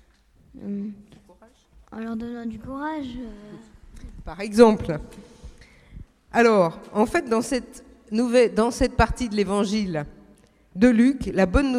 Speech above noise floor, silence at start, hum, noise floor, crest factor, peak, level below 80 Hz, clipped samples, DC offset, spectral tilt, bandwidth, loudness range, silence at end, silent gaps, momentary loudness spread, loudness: 35 dB; 0.55 s; none; -57 dBFS; 24 dB; 0 dBFS; -38 dBFS; under 0.1%; under 0.1%; -6 dB/octave; 13 kHz; 13 LU; 0 s; none; 22 LU; -22 LUFS